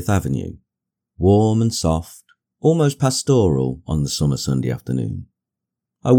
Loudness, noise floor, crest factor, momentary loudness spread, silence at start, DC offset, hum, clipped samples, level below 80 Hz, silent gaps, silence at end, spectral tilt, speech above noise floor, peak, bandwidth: -19 LUFS; -84 dBFS; 16 dB; 11 LU; 0 s; under 0.1%; none; under 0.1%; -40 dBFS; none; 0 s; -6.5 dB/octave; 66 dB; -2 dBFS; 18.5 kHz